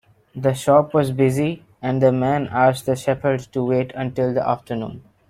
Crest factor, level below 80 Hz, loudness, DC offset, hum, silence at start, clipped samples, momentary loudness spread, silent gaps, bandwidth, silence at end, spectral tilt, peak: 18 dB; -54 dBFS; -20 LUFS; under 0.1%; none; 0.35 s; under 0.1%; 10 LU; none; 15.5 kHz; 0.3 s; -7 dB/octave; -2 dBFS